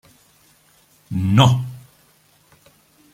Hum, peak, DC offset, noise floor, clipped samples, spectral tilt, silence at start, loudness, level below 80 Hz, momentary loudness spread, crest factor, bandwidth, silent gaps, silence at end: none; -2 dBFS; under 0.1%; -56 dBFS; under 0.1%; -6 dB/octave; 1.1 s; -17 LUFS; -54 dBFS; 20 LU; 20 dB; 15 kHz; none; 1.35 s